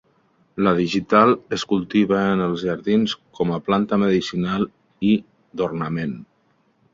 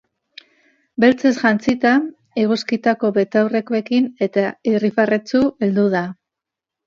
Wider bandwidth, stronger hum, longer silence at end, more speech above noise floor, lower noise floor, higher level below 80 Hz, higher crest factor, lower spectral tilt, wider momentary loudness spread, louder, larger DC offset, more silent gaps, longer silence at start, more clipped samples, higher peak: about the same, 7.6 kHz vs 7.4 kHz; neither; about the same, 0.7 s vs 0.75 s; second, 43 dB vs 68 dB; second, -63 dBFS vs -85 dBFS; first, -54 dBFS vs -60 dBFS; about the same, 20 dB vs 18 dB; about the same, -6.5 dB/octave vs -6.5 dB/octave; first, 9 LU vs 5 LU; second, -21 LUFS vs -18 LUFS; neither; neither; second, 0.55 s vs 1 s; neither; about the same, -2 dBFS vs 0 dBFS